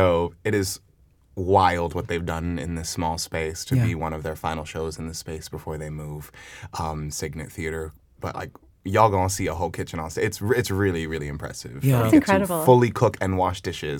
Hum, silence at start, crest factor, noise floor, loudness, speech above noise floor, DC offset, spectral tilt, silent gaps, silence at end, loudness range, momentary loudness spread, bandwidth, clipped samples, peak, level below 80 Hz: none; 0 s; 22 dB; -57 dBFS; -24 LUFS; 34 dB; under 0.1%; -5.5 dB/octave; none; 0 s; 11 LU; 17 LU; 19 kHz; under 0.1%; -2 dBFS; -48 dBFS